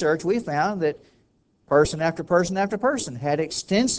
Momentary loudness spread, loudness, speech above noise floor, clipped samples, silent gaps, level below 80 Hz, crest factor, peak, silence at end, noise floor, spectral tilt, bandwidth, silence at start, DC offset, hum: 6 LU; -23 LUFS; 41 dB; under 0.1%; none; -50 dBFS; 18 dB; -6 dBFS; 0 s; -64 dBFS; -4.5 dB/octave; 8 kHz; 0 s; under 0.1%; none